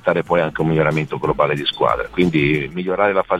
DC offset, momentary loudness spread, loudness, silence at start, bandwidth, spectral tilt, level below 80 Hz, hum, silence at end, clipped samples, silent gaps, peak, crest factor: 0.2%; 4 LU; -18 LUFS; 0.05 s; 12 kHz; -7 dB/octave; -42 dBFS; none; 0 s; under 0.1%; none; -2 dBFS; 16 dB